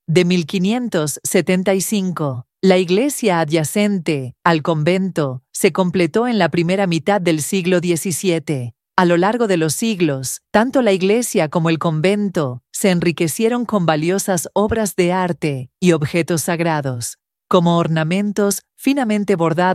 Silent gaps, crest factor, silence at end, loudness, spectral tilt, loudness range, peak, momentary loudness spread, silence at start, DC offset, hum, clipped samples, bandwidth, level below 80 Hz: none; 16 dB; 0 s; -17 LUFS; -5 dB/octave; 1 LU; 0 dBFS; 5 LU; 0.1 s; under 0.1%; none; under 0.1%; 15.5 kHz; -52 dBFS